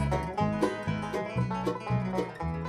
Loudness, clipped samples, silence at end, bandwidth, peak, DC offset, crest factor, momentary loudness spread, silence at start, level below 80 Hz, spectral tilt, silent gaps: -31 LUFS; under 0.1%; 0 s; 14 kHz; -14 dBFS; under 0.1%; 16 dB; 4 LU; 0 s; -44 dBFS; -7.5 dB/octave; none